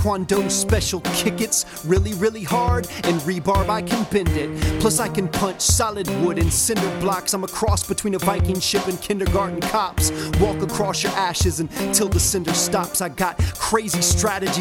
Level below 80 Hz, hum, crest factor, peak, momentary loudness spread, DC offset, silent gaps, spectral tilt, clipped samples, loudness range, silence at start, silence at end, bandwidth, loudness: -32 dBFS; none; 20 dB; -2 dBFS; 5 LU; under 0.1%; none; -4 dB/octave; under 0.1%; 1 LU; 0 s; 0 s; 17.5 kHz; -20 LUFS